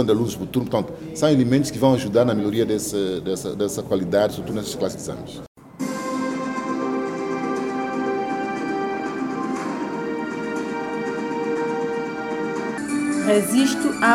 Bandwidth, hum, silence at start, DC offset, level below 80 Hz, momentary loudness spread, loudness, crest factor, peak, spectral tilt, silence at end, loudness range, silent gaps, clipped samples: 17 kHz; none; 0 s; under 0.1%; -54 dBFS; 8 LU; -23 LUFS; 18 dB; -4 dBFS; -5.5 dB/octave; 0 s; 5 LU; 5.48-5.55 s; under 0.1%